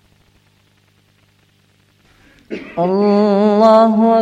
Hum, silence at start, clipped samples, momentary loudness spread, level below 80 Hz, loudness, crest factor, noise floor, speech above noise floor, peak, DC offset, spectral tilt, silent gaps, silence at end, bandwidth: 50 Hz at -45 dBFS; 2.5 s; under 0.1%; 18 LU; -60 dBFS; -12 LUFS; 16 dB; -55 dBFS; 44 dB; 0 dBFS; under 0.1%; -8 dB/octave; none; 0 s; 8 kHz